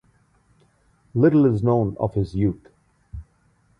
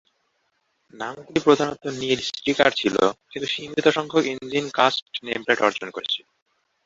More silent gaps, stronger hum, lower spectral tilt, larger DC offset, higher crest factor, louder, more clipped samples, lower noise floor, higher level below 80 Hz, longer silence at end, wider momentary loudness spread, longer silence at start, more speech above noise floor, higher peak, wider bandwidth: second, none vs 5.02-5.06 s; neither; first, -10.5 dB/octave vs -4 dB/octave; neither; about the same, 18 dB vs 22 dB; about the same, -21 LUFS vs -22 LUFS; neither; second, -62 dBFS vs -71 dBFS; first, -44 dBFS vs -62 dBFS; second, 0.55 s vs 0.7 s; first, 25 LU vs 10 LU; first, 1.15 s vs 0.95 s; second, 42 dB vs 48 dB; second, -6 dBFS vs -2 dBFS; second, 6.2 kHz vs 7.8 kHz